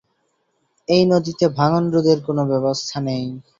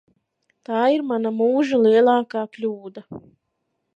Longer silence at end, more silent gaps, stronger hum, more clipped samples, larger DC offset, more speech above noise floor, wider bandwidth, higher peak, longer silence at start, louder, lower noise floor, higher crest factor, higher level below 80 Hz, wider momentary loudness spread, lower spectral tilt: second, 0.2 s vs 0.75 s; neither; neither; neither; neither; second, 50 dB vs 55 dB; about the same, 7.6 kHz vs 7.6 kHz; about the same, -2 dBFS vs -4 dBFS; first, 0.9 s vs 0.7 s; about the same, -19 LUFS vs -20 LUFS; second, -68 dBFS vs -75 dBFS; about the same, 16 dB vs 16 dB; first, -56 dBFS vs -72 dBFS; second, 8 LU vs 22 LU; about the same, -6.5 dB/octave vs -6.5 dB/octave